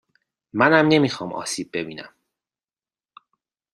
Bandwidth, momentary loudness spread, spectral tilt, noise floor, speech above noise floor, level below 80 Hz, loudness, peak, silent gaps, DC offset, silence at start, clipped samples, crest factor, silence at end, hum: 13 kHz; 17 LU; -5 dB/octave; under -90 dBFS; over 70 dB; -64 dBFS; -20 LUFS; -2 dBFS; none; under 0.1%; 0.55 s; under 0.1%; 22 dB; 1.65 s; none